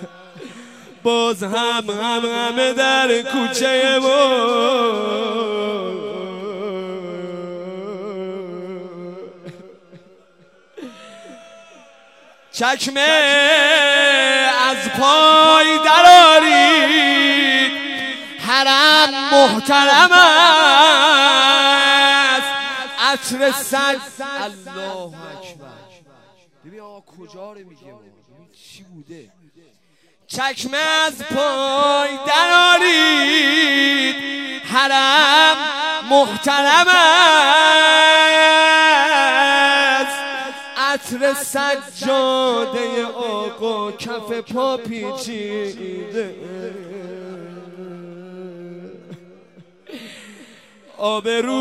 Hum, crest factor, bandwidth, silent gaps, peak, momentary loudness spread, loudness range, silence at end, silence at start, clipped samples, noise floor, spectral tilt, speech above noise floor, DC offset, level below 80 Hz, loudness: none; 16 dB; 16 kHz; none; 0 dBFS; 20 LU; 19 LU; 0 s; 0 s; under 0.1%; -59 dBFS; -1.5 dB/octave; 45 dB; under 0.1%; -70 dBFS; -13 LUFS